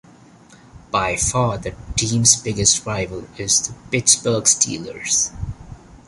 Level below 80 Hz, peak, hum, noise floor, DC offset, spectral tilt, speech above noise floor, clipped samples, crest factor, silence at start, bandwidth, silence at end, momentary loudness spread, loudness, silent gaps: -40 dBFS; 0 dBFS; none; -47 dBFS; under 0.1%; -2.5 dB/octave; 27 dB; under 0.1%; 20 dB; 0.5 s; 11.5 kHz; 0.1 s; 14 LU; -17 LUFS; none